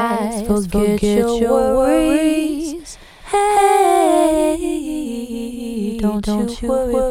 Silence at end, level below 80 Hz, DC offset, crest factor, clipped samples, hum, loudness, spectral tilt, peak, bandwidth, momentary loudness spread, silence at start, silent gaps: 0 s; -34 dBFS; under 0.1%; 14 dB; under 0.1%; none; -17 LUFS; -5.5 dB/octave; -2 dBFS; 17 kHz; 12 LU; 0 s; none